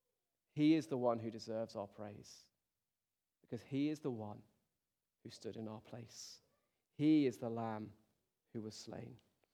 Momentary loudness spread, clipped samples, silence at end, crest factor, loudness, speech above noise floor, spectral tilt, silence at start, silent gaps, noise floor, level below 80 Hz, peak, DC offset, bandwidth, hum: 23 LU; under 0.1%; 0.4 s; 20 dB; -40 LUFS; over 50 dB; -6.5 dB/octave; 0.55 s; none; under -90 dBFS; -86 dBFS; -22 dBFS; under 0.1%; 12 kHz; none